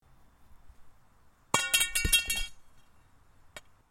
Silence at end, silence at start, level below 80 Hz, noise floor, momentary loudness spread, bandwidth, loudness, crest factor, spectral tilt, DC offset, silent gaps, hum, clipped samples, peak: 0.3 s; 0.5 s; -44 dBFS; -61 dBFS; 26 LU; 16.5 kHz; -27 LUFS; 26 dB; -0.5 dB/octave; under 0.1%; none; none; under 0.1%; -8 dBFS